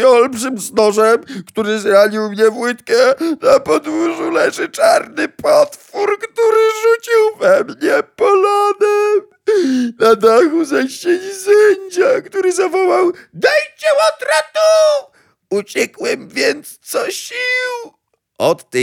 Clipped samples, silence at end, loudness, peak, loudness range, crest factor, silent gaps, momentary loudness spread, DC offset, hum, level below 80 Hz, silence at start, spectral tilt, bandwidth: under 0.1%; 0 s; -14 LUFS; 0 dBFS; 3 LU; 14 dB; none; 9 LU; under 0.1%; none; -62 dBFS; 0 s; -3.5 dB/octave; 17 kHz